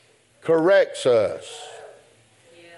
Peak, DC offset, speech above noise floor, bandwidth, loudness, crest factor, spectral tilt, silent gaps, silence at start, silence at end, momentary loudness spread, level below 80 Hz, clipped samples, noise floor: -8 dBFS; under 0.1%; 36 dB; 11.5 kHz; -20 LUFS; 16 dB; -4.5 dB/octave; none; 0.45 s; 0.9 s; 20 LU; -74 dBFS; under 0.1%; -55 dBFS